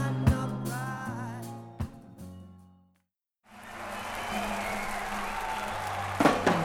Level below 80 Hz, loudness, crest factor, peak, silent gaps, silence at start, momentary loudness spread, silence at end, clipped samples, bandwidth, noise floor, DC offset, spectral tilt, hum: -46 dBFS; -32 LUFS; 24 dB; -8 dBFS; none; 0 s; 21 LU; 0 s; under 0.1%; 17.5 kHz; -77 dBFS; under 0.1%; -5.5 dB/octave; none